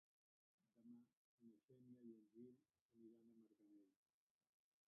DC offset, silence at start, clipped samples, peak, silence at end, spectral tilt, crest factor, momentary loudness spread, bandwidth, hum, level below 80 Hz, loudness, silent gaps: under 0.1%; 0.6 s; under 0.1%; -54 dBFS; 0.95 s; -9.5 dB/octave; 18 dB; 4 LU; 1.4 kHz; none; under -90 dBFS; -67 LUFS; 1.17-1.38 s, 1.64-1.68 s, 2.81-2.89 s